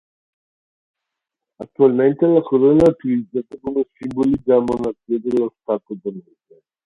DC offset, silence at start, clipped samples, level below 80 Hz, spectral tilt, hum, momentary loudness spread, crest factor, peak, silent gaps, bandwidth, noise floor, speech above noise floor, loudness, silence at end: under 0.1%; 1.6 s; under 0.1%; -52 dBFS; -9 dB/octave; none; 14 LU; 18 dB; -2 dBFS; none; 7.6 kHz; -83 dBFS; 65 dB; -18 LUFS; 0.65 s